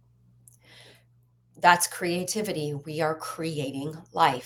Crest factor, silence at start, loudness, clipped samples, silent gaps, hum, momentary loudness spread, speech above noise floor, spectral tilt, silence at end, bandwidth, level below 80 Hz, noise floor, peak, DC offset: 24 dB; 0.75 s; -27 LUFS; under 0.1%; none; none; 12 LU; 36 dB; -3.5 dB/octave; 0 s; 17 kHz; -68 dBFS; -63 dBFS; -4 dBFS; under 0.1%